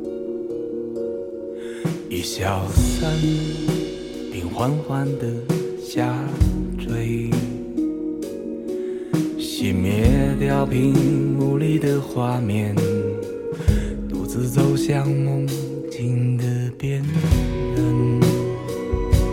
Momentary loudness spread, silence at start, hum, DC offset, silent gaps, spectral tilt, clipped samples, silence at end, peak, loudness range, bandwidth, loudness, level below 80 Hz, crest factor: 9 LU; 0 s; none; under 0.1%; none; -7 dB/octave; under 0.1%; 0 s; -2 dBFS; 5 LU; 17 kHz; -22 LUFS; -32 dBFS; 18 dB